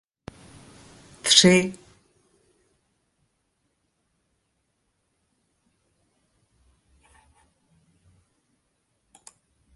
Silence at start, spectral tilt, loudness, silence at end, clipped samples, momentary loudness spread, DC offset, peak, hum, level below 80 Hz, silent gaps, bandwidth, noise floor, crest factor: 1.25 s; -3 dB/octave; -18 LUFS; 8 s; under 0.1%; 31 LU; under 0.1%; -2 dBFS; none; -64 dBFS; none; 11.5 kHz; -74 dBFS; 28 dB